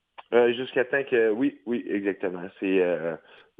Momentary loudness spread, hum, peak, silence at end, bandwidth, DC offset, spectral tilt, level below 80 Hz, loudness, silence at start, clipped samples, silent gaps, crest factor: 9 LU; none; -8 dBFS; 0.4 s; 3.9 kHz; under 0.1%; -8 dB/octave; -74 dBFS; -26 LUFS; 0.2 s; under 0.1%; none; 18 dB